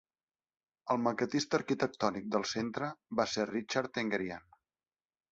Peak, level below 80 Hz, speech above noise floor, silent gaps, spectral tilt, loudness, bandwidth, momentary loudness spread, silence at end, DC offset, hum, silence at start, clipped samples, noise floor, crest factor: -14 dBFS; -70 dBFS; over 56 dB; none; -3.5 dB/octave; -34 LUFS; 8 kHz; 6 LU; 0.9 s; under 0.1%; none; 0.85 s; under 0.1%; under -90 dBFS; 22 dB